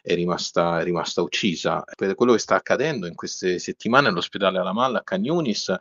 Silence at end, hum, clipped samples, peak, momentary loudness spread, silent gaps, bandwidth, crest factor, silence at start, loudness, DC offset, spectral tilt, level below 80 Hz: 0 s; none; under 0.1%; 0 dBFS; 7 LU; none; 7.8 kHz; 22 dB; 0.05 s; -22 LUFS; under 0.1%; -3.5 dB/octave; -62 dBFS